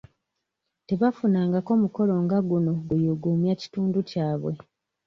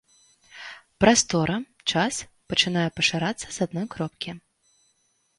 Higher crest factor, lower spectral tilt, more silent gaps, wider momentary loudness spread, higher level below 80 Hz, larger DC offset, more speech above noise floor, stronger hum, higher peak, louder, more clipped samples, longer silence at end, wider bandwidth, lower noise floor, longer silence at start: second, 16 dB vs 22 dB; first, -9.5 dB/octave vs -3.5 dB/octave; neither; second, 6 LU vs 21 LU; second, -60 dBFS vs -54 dBFS; neither; first, 58 dB vs 45 dB; neither; second, -10 dBFS vs -4 dBFS; about the same, -25 LUFS vs -24 LUFS; neither; second, 0.5 s vs 1 s; second, 6.8 kHz vs 11.5 kHz; first, -81 dBFS vs -69 dBFS; first, 0.9 s vs 0.55 s